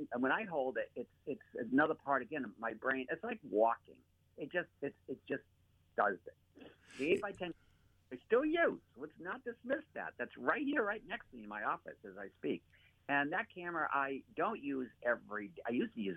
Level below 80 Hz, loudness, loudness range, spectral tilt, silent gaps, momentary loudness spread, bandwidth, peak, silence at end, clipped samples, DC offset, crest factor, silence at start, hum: -76 dBFS; -38 LUFS; 3 LU; -6.5 dB/octave; none; 14 LU; 10.5 kHz; -18 dBFS; 0 s; under 0.1%; under 0.1%; 22 dB; 0 s; none